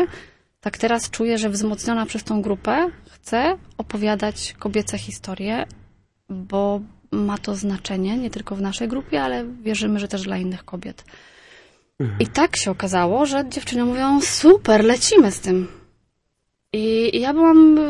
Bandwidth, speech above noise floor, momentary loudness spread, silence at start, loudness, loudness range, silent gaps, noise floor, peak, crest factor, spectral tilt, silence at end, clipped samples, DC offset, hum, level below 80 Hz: 11.5 kHz; 54 dB; 15 LU; 0 s; -20 LUFS; 9 LU; none; -73 dBFS; -2 dBFS; 18 dB; -4.5 dB/octave; 0 s; under 0.1%; under 0.1%; none; -48 dBFS